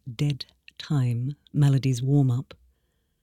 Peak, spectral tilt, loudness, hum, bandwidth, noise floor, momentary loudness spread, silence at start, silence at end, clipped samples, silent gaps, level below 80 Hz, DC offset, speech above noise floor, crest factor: -10 dBFS; -7.5 dB/octave; -25 LUFS; none; 11.5 kHz; -71 dBFS; 16 LU; 0.05 s; 0.8 s; under 0.1%; none; -56 dBFS; under 0.1%; 48 dB; 16 dB